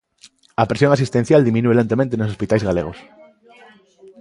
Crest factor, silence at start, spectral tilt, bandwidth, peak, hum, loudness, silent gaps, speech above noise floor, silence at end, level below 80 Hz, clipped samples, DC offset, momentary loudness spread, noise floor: 18 dB; 0.6 s; -7.5 dB/octave; 11.5 kHz; 0 dBFS; none; -17 LUFS; none; 34 dB; 1.2 s; -46 dBFS; under 0.1%; under 0.1%; 8 LU; -51 dBFS